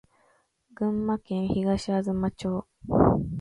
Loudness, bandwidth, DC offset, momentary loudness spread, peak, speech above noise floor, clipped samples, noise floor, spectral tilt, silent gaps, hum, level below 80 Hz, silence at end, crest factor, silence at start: -27 LUFS; 11 kHz; under 0.1%; 9 LU; -8 dBFS; 39 dB; under 0.1%; -67 dBFS; -8 dB/octave; none; none; -46 dBFS; 0 s; 20 dB; 0.8 s